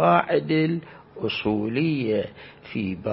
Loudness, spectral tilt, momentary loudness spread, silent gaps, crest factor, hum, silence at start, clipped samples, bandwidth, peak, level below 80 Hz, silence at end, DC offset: -25 LUFS; -11 dB/octave; 14 LU; none; 20 dB; none; 0 s; under 0.1%; 5.8 kHz; -4 dBFS; -58 dBFS; 0 s; under 0.1%